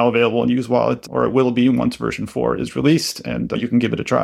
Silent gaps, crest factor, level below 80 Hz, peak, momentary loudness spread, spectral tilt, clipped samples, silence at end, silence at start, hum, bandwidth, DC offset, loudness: none; 16 dB; -48 dBFS; -2 dBFS; 7 LU; -6 dB/octave; under 0.1%; 0 s; 0 s; none; 14.5 kHz; under 0.1%; -19 LUFS